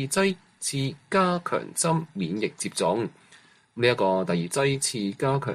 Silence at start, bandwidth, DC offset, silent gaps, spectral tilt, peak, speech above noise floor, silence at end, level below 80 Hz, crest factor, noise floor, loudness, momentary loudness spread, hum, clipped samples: 0 s; 15 kHz; under 0.1%; none; -4.5 dB/octave; -8 dBFS; 30 dB; 0 s; -64 dBFS; 18 dB; -56 dBFS; -26 LUFS; 7 LU; none; under 0.1%